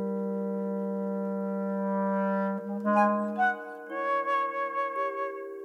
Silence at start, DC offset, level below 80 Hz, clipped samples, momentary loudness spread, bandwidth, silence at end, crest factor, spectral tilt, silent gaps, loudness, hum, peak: 0 s; under 0.1%; -84 dBFS; under 0.1%; 6 LU; 6.4 kHz; 0 s; 16 dB; -8.5 dB/octave; none; -30 LUFS; none; -12 dBFS